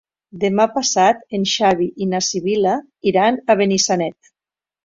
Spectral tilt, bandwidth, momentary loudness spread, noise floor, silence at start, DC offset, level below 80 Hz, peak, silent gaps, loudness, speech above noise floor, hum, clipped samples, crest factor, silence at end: -3.5 dB/octave; 7.8 kHz; 6 LU; under -90 dBFS; 0.35 s; under 0.1%; -60 dBFS; -2 dBFS; none; -17 LUFS; over 73 dB; none; under 0.1%; 16 dB; 0.7 s